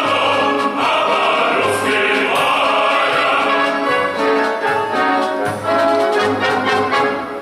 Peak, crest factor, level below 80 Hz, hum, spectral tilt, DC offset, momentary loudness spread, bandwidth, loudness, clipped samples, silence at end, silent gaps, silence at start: -4 dBFS; 12 dB; -58 dBFS; none; -3.5 dB/octave; under 0.1%; 3 LU; 16 kHz; -15 LUFS; under 0.1%; 0 s; none; 0 s